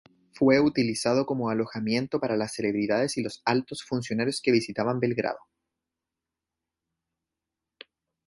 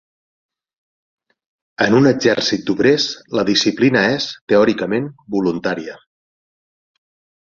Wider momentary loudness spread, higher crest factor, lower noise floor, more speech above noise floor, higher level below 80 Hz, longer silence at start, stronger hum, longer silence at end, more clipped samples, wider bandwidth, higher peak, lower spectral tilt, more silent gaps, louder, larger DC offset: about the same, 8 LU vs 9 LU; about the same, 20 dB vs 18 dB; about the same, -88 dBFS vs under -90 dBFS; second, 62 dB vs over 74 dB; second, -66 dBFS vs -56 dBFS; second, 0.35 s vs 1.8 s; neither; first, 2.9 s vs 1.5 s; neither; first, 11.5 kHz vs 7.6 kHz; second, -8 dBFS vs -2 dBFS; about the same, -5.5 dB/octave vs -5 dB/octave; second, none vs 4.41-4.47 s; second, -26 LUFS vs -16 LUFS; neither